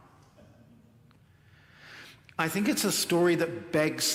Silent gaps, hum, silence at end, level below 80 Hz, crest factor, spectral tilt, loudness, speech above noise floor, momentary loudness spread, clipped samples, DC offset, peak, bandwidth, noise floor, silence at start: none; none; 0 s; -70 dBFS; 20 dB; -3.5 dB/octave; -27 LUFS; 32 dB; 23 LU; under 0.1%; under 0.1%; -12 dBFS; 16.5 kHz; -59 dBFS; 1.85 s